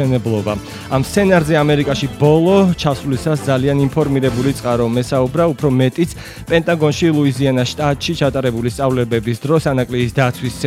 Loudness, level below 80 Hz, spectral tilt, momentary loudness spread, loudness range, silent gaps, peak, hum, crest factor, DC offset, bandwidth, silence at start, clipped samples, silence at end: -16 LUFS; -38 dBFS; -6.5 dB/octave; 6 LU; 2 LU; none; 0 dBFS; none; 16 dB; under 0.1%; 15.5 kHz; 0 s; under 0.1%; 0 s